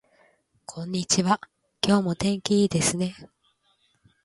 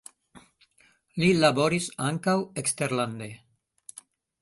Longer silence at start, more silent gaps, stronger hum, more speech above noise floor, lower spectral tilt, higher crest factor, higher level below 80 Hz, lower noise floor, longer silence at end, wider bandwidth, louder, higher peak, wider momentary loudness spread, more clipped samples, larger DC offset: first, 0.7 s vs 0.35 s; neither; neither; first, 44 dB vs 38 dB; about the same, -4.5 dB/octave vs -4.5 dB/octave; about the same, 22 dB vs 22 dB; first, -56 dBFS vs -62 dBFS; first, -68 dBFS vs -64 dBFS; about the same, 1 s vs 1.05 s; about the same, 11.5 kHz vs 12 kHz; about the same, -24 LUFS vs -25 LUFS; about the same, -4 dBFS vs -6 dBFS; second, 12 LU vs 22 LU; neither; neither